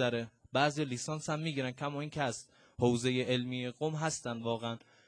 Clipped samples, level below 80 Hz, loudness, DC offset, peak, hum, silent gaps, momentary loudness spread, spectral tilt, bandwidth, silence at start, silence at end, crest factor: under 0.1%; -68 dBFS; -35 LUFS; under 0.1%; -16 dBFS; none; none; 7 LU; -5 dB/octave; 11 kHz; 0 s; 0.3 s; 20 dB